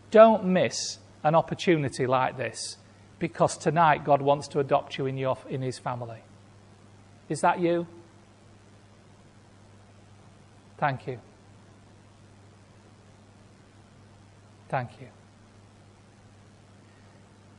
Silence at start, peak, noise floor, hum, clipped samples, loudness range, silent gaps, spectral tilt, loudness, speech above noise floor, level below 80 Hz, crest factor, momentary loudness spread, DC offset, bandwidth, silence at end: 0.1 s; -4 dBFS; -54 dBFS; none; under 0.1%; 16 LU; none; -5.5 dB/octave; -26 LUFS; 29 dB; -64 dBFS; 24 dB; 15 LU; under 0.1%; 11 kHz; 2.5 s